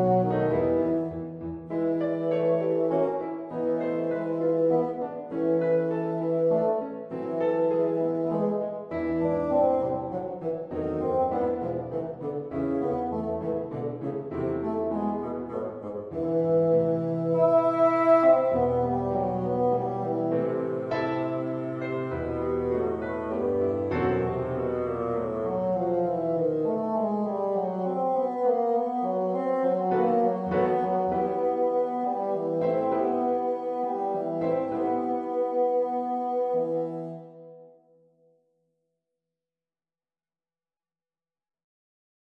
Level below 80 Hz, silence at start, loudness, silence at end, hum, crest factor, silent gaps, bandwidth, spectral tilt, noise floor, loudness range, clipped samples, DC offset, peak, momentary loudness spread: -56 dBFS; 0 s; -27 LUFS; 4.65 s; none; 18 dB; none; 5.6 kHz; -10 dB/octave; under -90 dBFS; 7 LU; under 0.1%; under 0.1%; -10 dBFS; 9 LU